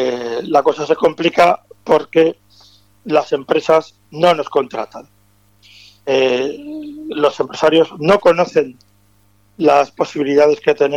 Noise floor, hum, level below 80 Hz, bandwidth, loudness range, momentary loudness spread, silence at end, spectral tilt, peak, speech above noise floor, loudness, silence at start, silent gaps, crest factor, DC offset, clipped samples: -55 dBFS; 50 Hz at -55 dBFS; -56 dBFS; 11.5 kHz; 4 LU; 14 LU; 0 s; -5.5 dB/octave; -2 dBFS; 40 dB; -15 LUFS; 0 s; none; 14 dB; under 0.1%; under 0.1%